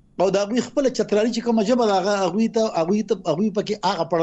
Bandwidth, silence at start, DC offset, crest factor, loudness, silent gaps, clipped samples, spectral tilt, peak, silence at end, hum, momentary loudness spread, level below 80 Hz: 8.2 kHz; 0.2 s; under 0.1%; 12 dB; -21 LUFS; none; under 0.1%; -5.5 dB/octave; -8 dBFS; 0 s; none; 4 LU; -58 dBFS